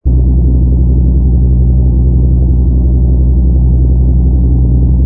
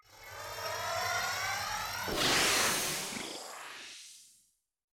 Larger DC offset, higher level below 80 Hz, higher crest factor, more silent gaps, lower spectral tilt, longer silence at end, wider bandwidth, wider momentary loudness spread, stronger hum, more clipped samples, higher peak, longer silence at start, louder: neither; first, -8 dBFS vs -60 dBFS; second, 8 dB vs 20 dB; neither; first, -16.5 dB/octave vs -1 dB/octave; second, 0 s vs 0.75 s; second, 1.1 kHz vs 17 kHz; second, 1 LU vs 19 LU; neither; neither; first, 0 dBFS vs -16 dBFS; about the same, 0.05 s vs 0.1 s; first, -10 LUFS vs -32 LUFS